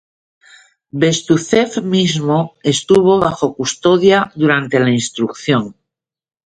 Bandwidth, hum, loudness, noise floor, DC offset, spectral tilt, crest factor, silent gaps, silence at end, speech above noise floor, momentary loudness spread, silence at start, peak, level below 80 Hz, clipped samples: 9.6 kHz; none; -14 LUFS; -81 dBFS; under 0.1%; -5 dB/octave; 16 dB; none; 0.75 s; 67 dB; 7 LU; 0.95 s; 0 dBFS; -52 dBFS; under 0.1%